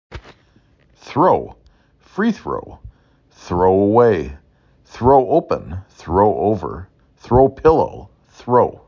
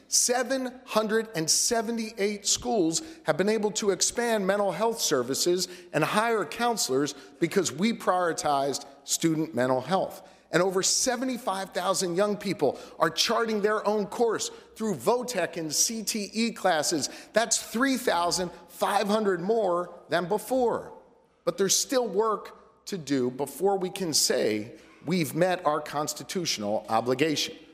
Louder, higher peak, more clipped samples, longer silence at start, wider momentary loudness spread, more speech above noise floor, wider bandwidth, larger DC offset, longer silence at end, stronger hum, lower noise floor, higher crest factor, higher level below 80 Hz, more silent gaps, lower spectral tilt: first, -16 LUFS vs -27 LUFS; first, -2 dBFS vs -8 dBFS; neither; about the same, 0.1 s vs 0.1 s; first, 18 LU vs 7 LU; first, 39 dB vs 29 dB; second, 7 kHz vs 16 kHz; neither; about the same, 0.15 s vs 0.1 s; neither; about the same, -54 dBFS vs -56 dBFS; about the same, 16 dB vs 20 dB; first, -38 dBFS vs -66 dBFS; neither; first, -8.5 dB/octave vs -3 dB/octave